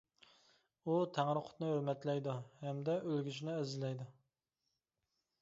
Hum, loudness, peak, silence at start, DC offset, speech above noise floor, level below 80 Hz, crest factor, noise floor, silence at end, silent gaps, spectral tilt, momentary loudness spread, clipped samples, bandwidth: none; -40 LUFS; -20 dBFS; 0.85 s; under 0.1%; 49 dB; -84 dBFS; 22 dB; -88 dBFS; 1.3 s; none; -6.5 dB/octave; 8 LU; under 0.1%; 7.6 kHz